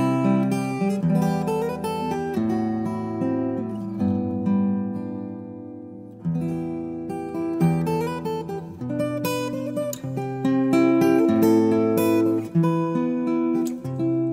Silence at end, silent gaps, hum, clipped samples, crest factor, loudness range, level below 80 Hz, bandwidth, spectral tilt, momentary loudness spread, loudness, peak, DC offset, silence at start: 0 s; none; none; under 0.1%; 16 dB; 7 LU; -58 dBFS; 16 kHz; -7.5 dB/octave; 12 LU; -23 LUFS; -8 dBFS; under 0.1%; 0 s